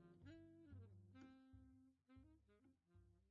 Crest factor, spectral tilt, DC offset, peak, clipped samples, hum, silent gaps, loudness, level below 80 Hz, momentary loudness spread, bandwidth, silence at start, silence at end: 16 dB; -7.5 dB/octave; under 0.1%; -50 dBFS; under 0.1%; none; none; -66 LUFS; -80 dBFS; 5 LU; 5 kHz; 0 s; 0 s